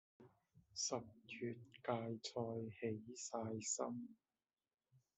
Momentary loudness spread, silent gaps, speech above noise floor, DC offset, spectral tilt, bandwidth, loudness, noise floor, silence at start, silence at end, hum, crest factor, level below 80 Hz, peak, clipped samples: 8 LU; none; over 44 dB; under 0.1%; -4 dB/octave; 8.2 kHz; -46 LUFS; under -90 dBFS; 0.2 s; 0.2 s; none; 24 dB; -86 dBFS; -26 dBFS; under 0.1%